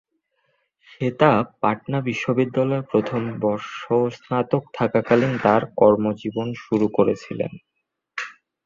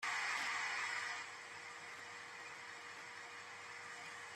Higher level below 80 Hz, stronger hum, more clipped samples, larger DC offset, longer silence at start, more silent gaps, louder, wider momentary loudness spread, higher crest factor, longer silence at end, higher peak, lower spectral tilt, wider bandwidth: first, -60 dBFS vs under -90 dBFS; neither; neither; neither; first, 1 s vs 0 s; neither; first, -22 LUFS vs -44 LUFS; about the same, 12 LU vs 12 LU; about the same, 20 dB vs 16 dB; first, 0.35 s vs 0 s; first, -2 dBFS vs -30 dBFS; first, -7.5 dB/octave vs 0 dB/octave; second, 7.4 kHz vs 13.5 kHz